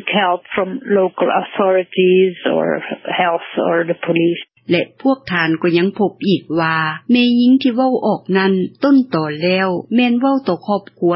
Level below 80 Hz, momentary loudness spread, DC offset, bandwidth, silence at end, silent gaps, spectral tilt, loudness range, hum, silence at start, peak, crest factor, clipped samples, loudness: -62 dBFS; 6 LU; under 0.1%; 5.8 kHz; 0 s; none; -11 dB/octave; 2 LU; none; 0 s; -2 dBFS; 14 dB; under 0.1%; -16 LUFS